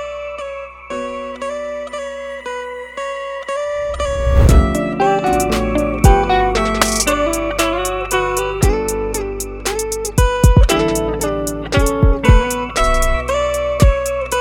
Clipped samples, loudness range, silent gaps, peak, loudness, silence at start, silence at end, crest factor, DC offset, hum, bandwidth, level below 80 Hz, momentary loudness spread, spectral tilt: under 0.1%; 9 LU; none; 0 dBFS; -17 LUFS; 0 s; 0 s; 16 dB; under 0.1%; none; 17.5 kHz; -20 dBFS; 13 LU; -5 dB/octave